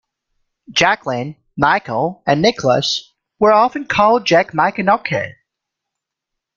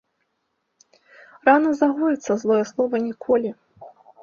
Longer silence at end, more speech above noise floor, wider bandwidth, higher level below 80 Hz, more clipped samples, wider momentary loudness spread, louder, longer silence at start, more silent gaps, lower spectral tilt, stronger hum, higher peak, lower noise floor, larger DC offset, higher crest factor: first, 1.25 s vs 0.35 s; first, 66 dB vs 54 dB; about the same, 7.6 kHz vs 7.2 kHz; first, -52 dBFS vs -68 dBFS; neither; first, 10 LU vs 6 LU; first, -16 LUFS vs -21 LUFS; second, 0.7 s vs 1.45 s; neither; second, -4.5 dB/octave vs -6 dB/octave; neither; about the same, 0 dBFS vs -2 dBFS; first, -81 dBFS vs -74 dBFS; neither; about the same, 16 dB vs 20 dB